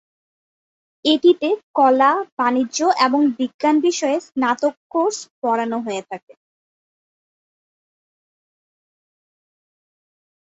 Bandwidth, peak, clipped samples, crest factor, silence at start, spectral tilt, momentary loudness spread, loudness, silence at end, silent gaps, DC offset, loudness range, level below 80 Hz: 8 kHz; -2 dBFS; under 0.1%; 18 dB; 1.05 s; -3 dB/octave; 9 LU; -19 LUFS; 4.3 s; 1.63-1.74 s, 2.32-2.37 s, 3.54-3.59 s, 4.77-4.90 s, 5.31-5.42 s; under 0.1%; 11 LU; -70 dBFS